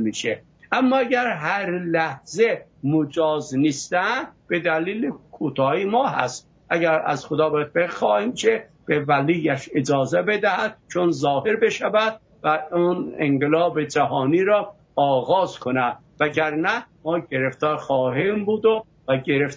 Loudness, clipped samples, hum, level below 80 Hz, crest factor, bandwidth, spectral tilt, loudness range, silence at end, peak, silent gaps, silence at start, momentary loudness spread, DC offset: -22 LUFS; under 0.1%; none; -62 dBFS; 18 dB; 8 kHz; -5.5 dB/octave; 2 LU; 0 s; -4 dBFS; none; 0 s; 6 LU; under 0.1%